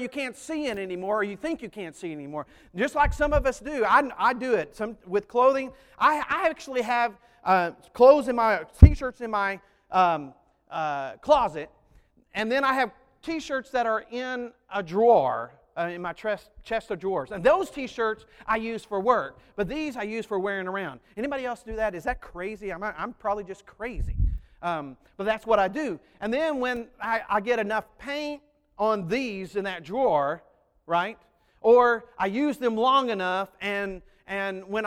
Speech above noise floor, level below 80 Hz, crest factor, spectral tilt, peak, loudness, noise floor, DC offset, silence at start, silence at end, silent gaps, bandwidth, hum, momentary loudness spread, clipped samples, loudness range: 34 dB; -36 dBFS; 26 dB; -6.5 dB/octave; 0 dBFS; -26 LUFS; -59 dBFS; under 0.1%; 0 s; 0 s; none; 14.5 kHz; none; 13 LU; under 0.1%; 9 LU